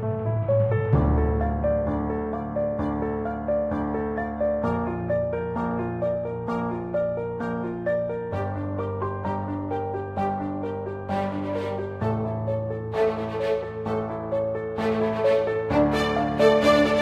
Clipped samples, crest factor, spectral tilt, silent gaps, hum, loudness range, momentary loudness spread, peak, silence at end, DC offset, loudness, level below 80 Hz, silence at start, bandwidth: under 0.1%; 18 dB; -7.5 dB/octave; none; none; 4 LU; 7 LU; -6 dBFS; 0 s; under 0.1%; -26 LUFS; -38 dBFS; 0 s; 12.5 kHz